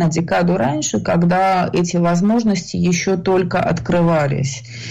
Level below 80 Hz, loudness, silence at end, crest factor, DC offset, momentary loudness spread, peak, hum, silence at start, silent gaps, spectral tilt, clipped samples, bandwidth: -44 dBFS; -17 LUFS; 0 s; 8 dB; under 0.1%; 4 LU; -8 dBFS; none; 0 s; none; -6 dB/octave; under 0.1%; 8 kHz